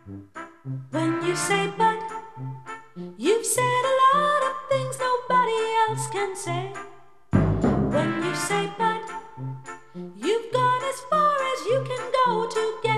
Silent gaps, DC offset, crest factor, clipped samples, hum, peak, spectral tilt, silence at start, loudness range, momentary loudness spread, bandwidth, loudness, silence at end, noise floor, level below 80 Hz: none; 0.3%; 18 dB; under 0.1%; none; -6 dBFS; -4.5 dB/octave; 0.05 s; 4 LU; 17 LU; 13 kHz; -24 LUFS; 0 s; -49 dBFS; -48 dBFS